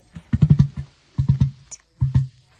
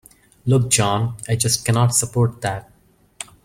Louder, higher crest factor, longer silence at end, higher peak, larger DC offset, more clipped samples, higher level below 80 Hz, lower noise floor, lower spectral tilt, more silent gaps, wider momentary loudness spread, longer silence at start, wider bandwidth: about the same, -21 LUFS vs -19 LUFS; about the same, 18 dB vs 18 dB; about the same, 0.3 s vs 0.2 s; about the same, -2 dBFS vs -2 dBFS; neither; neither; first, -34 dBFS vs -50 dBFS; first, -44 dBFS vs -40 dBFS; first, -8.5 dB/octave vs -4 dB/octave; neither; first, 19 LU vs 14 LU; second, 0.15 s vs 0.45 s; second, 7.6 kHz vs 16 kHz